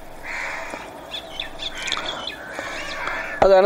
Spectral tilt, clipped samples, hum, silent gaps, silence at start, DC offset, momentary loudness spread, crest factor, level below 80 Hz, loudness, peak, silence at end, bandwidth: -3 dB/octave; under 0.1%; none; none; 0 s; under 0.1%; 9 LU; 20 dB; -42 dBFS; -26 LUFS; -4 dBFS; 0 s; 16 kHz